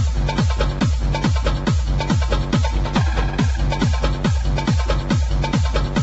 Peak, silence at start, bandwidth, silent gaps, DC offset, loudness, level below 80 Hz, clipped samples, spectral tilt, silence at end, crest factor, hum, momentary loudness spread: -4 dBFS; 0 s; 8.2 kHz; none; under 0.1%; -20 LUFS; -22 dBFS; under 0.1%; -6 dB/octave; 0 s; 14 dB; none; 1 LU